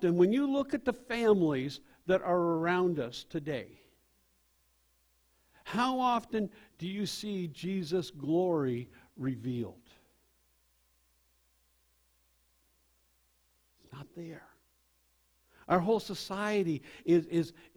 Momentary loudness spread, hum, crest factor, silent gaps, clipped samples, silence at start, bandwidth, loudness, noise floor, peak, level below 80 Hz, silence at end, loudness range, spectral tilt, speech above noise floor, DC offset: 16 LU; none; 20 dB; none; under 0.1%; 0 s; over 20 kHz; -32 LUFS; -72 dBFS; -14 dBFS; -68 dBFS; 0.25 s; 23 LU; -6.5 dB/octave; 41 dB; under 0.1%